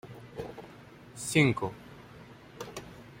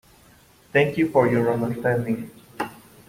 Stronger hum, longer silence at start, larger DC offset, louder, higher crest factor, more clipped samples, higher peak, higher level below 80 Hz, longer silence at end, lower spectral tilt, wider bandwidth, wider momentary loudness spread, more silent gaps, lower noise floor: neither; second, 0.05 s vs 0.75 s; neither; second, -31 LUFS vs -23 LUFS; about the same, 24 dB vs 20 dB; neither; second, -10 dBFS vs -4 dBFS; second, -62 dBFS vs -56 dBFS; second, 0 s vs 0.35 s; second, -5 dB/octave vs -7.5 dB/octave; about the same, 16 kHz vs 16.5 kHz; first, 25 LU vs 14 LU; neither; about the same, -51 dBFS vs -54 dBFS